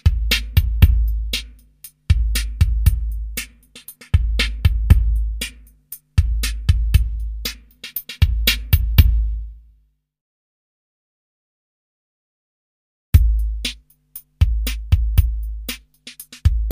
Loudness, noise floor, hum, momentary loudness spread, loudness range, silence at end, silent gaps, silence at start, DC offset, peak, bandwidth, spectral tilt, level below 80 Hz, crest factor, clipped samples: -20 LUFS; -59 dBFS; none; 21 LU; 5 LU; 0 s; 10.21-13.13 s; 0.05 s; under 0.1%; 0 dBFS; 15.5 kHz; -4.5 dB/octave; -20 dBFS; 20 dB; under 0.1%